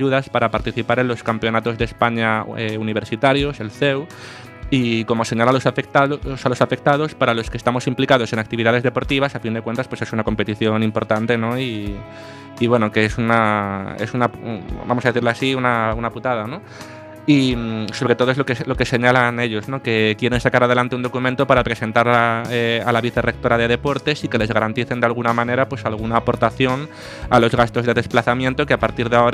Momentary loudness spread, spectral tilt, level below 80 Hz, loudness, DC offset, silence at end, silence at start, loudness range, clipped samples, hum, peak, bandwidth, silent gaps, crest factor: 8 LU; -6 dB/octave; -40 dBFS; -19 LUFS; under 0.1%; 0 s; 0 s; 3 LU; under 0.1%; none; 0 dBFS; 14 kHz; none; 18 dB